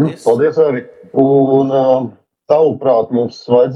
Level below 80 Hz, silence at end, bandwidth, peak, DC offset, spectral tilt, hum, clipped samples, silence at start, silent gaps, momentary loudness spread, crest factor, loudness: -62 dBFS; 0 s; 11 kHz; 0 dBFS; under 0.1%; -8 dB/octave; none; under 0.1%; 0 s; none; 7 LU; 12 dB; -13 LUFS